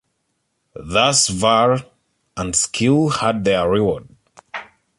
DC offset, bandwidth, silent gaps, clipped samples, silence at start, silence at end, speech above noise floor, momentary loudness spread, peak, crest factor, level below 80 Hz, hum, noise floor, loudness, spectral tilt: under 0.1%; 11.5 kHz; none; under 0.1%; 0.8 s; 0.35 s; 54 dB; 18 LU; -2 dBFS; 18 dB; -46 dBFS; none; -71 dBFS; -17 LUFS; -3.5 dB/octave